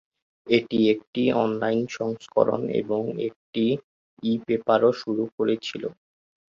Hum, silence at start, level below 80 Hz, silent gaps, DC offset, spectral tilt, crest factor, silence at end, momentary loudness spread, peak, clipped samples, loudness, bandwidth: none; 0.45 s; -66 dBFS; 1.07-1.13 s, 3.36-3.53 s, 3.84-4.17 s, 5.32-5.38 s; under 0.1%; -6.5 dB/octave; 20 dB; 0.55 s; 10 LU; -6 dBFS; under 0.1%; -25 LUFS; 7.4 kHz